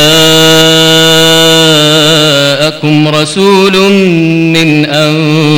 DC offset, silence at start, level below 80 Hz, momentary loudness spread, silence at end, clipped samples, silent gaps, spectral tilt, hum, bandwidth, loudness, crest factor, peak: under 0.1%; 0 s; -40 dBFS; 5 LU; 0 s; 0.6%; none; -4 dB/octave; none; 19 kHz; -5 LUFS; 6 dB; 0 dBFS